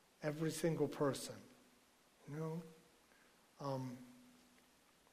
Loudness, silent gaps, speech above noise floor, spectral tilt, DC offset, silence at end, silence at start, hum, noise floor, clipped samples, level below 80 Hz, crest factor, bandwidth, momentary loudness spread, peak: -43 LUFS; none; 30 dB; -5.5 dB/octave; under 0.1%; 0.8 s; 0.2 s; none; -71 dBFS; under 0.1%; -78 dBFS; 20 dB; 15.5 kHz; 23 LU; -26 dBFS